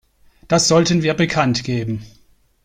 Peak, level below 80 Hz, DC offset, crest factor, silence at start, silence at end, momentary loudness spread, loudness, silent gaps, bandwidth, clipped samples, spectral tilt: -2 dBFS; -48 dBFS; under 0.1%; 16 dB; 0.5 s; 0.6 s; 11 LU; -17 LUFS; none; 15 kHz; under 0.1%; -4.5 dB/octave